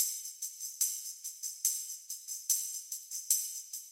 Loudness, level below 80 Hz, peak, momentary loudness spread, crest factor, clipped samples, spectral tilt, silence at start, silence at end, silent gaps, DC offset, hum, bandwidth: -34 LUFS; under -90 dBFS; -12 dBFS; 10 LU; 26 dB; under 0.1%; 10.5 dB/octave; 0 s; 0 s; none; under 0.1%; none; 16.5 kHz